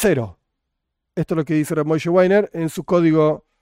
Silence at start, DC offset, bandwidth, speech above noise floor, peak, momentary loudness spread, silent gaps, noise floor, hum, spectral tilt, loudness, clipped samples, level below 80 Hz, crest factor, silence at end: 0 s; under 0.1%; 16 kHz; 60 dB; -4 dBFS; 11 LU; none; -77 dBFS; none; -7 dB/octave; -19 LUFS; under 0.1%; -50 dBFS; 14 dB; 0.25 s